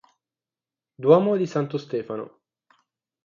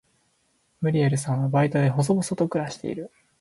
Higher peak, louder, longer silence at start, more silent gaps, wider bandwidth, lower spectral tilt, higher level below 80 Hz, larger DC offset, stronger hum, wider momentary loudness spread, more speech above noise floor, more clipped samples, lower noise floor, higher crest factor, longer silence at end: first, -4 dBFS vs -8 dBFS; about the same, -23 LUFS vs -24 LUFS; first, 1 s vs 0.8 s; neither; second, 7.2 kHz vs 11.5 kHz; about the same, -8 dB/octave vs -7 dB/octave; second, -72 dBFS vs -62 dBFS; neither; neither; first, 16 LU vs 11 LU; first, over 68 dB vs 45 dB; neither; first, under -90 dBFS vs -68 dBFS; first, 22 dB vs 16 dB; first, 0.95 s vs 0.35 s